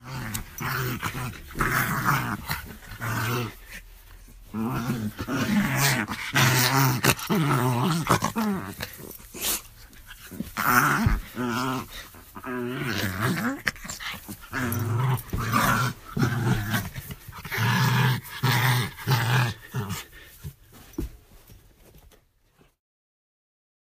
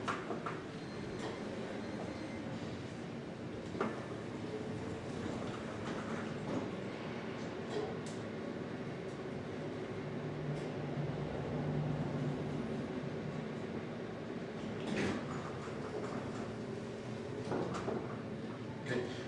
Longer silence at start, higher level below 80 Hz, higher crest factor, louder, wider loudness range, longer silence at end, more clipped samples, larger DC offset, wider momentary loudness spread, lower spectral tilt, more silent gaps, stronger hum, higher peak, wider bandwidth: about the same, 0 s vs 0 s; first, -44 dBFS vs -64 dBFS; first, 24 dB vs 18 dB; first, -26 LUFS vs -41 LUFS; first, 8 LU vs 3 LU; first, 2.3 s vs 0 s; neither; neither; first, 18 LU vs 6 LU; second, -4.5 dB/octave vs -6.5 dB/octave; neither; neither; first, -2 dBFS vs -24 dBFS; first, 15.5 kHz vs 11 kHz